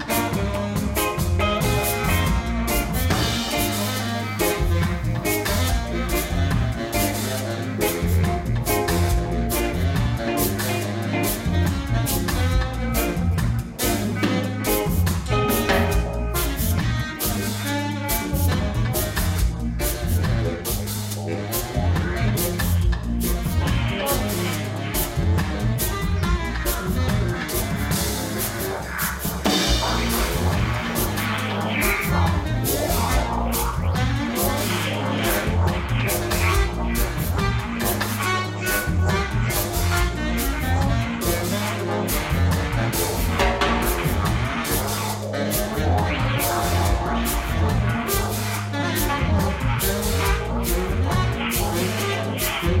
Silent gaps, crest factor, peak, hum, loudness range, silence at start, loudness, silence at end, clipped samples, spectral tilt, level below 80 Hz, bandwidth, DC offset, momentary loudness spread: none; 16 dB; -6 dBFS; none; 2 LU; 0 s; -23 LUFS; 0 s; under 0.1%; -4.5 dB/octave; -28 dBFS; 16.5 kHz; under 0.1%; 4 LU